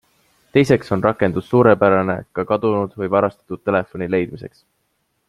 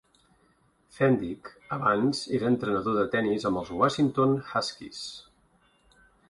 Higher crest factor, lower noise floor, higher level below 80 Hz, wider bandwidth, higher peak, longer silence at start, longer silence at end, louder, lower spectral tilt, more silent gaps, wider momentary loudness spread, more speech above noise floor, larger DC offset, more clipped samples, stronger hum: about the same, 18 dB vs 18 dB; about the same, -69 dBFS vs -66 dBFS; first, -54 dBFS vs -60 dBFS; about the same, 12.5 kHz vs 11.5 kHz; first, 0 dBFS vs -10 dBFS; second, 0.55 s vs 0.95 s; second, 0.8 s vs 1.1 s; first, -18 LUFS vs -27 LUFS; first, -7.5 dB/octave vs -6 dB/octave; neither; second, 10 LU vs 14 LU; first, 51 dB vs 39 dB; neither; neither; neither